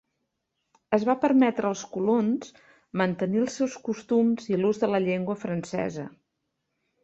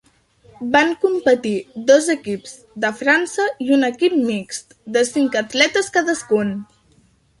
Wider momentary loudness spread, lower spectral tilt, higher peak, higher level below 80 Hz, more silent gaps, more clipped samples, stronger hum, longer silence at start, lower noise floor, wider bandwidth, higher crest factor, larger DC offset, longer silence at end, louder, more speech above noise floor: about the same, 11 LU vs 12 LU; first, -6.5 dB/octave vs -3.5 dB/octave; second, -8 dBFS vs 0 dBFS; second, -68 dBFS vs -62 dBFS; neither; neither; neither; first, 0.9 s vs 0.6 s; first, -80 dBFS vs -56 dBFS; second, 8 kHz vs 11.5 kHz; about the same, 18 dB vs 18 dB; neither; first, 0.95 s vs 0.75 s; second, -26 LUFS vs -18 LUFS; first, 54 dB vs 38 dB